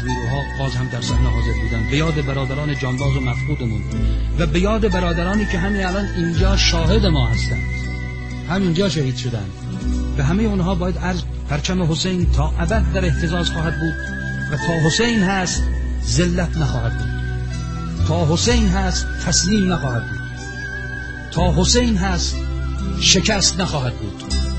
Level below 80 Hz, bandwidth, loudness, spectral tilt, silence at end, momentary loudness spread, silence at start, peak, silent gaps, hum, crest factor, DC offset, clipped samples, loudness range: -24 dBFS; 8.8 kHz; -19 LUFS; -4.5 dB/octave; 0 s; 9 LU; 0 s; 0 dBFS; none; none; 18 dB; 0.5%; under 0.1%; 3 LU